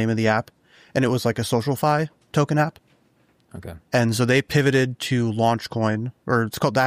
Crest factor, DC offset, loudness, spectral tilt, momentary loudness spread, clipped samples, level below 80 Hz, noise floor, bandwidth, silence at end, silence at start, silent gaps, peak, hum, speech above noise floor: 16 dB; under 0.1%; -22 LUFS; -6 dB/octave; 8 LU; under 0.1%; -56 dBFS; -61 dBFS; 15.5 kHz; 0 s; 0 s; none; -6 dBFS; none; 40 dB